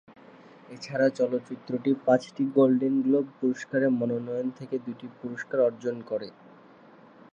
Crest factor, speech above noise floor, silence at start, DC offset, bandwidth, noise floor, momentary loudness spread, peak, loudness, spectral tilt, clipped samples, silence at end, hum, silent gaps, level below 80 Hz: 20 dB; 26 dB; 0.1 s; under 0.1%; 7.6 kHz; -53 dBFS; 14 LU; -8 dBFS; -27 LUFS; -7 dB/octave; under 0.1%; 1.05 s; none; none; -80 dBFS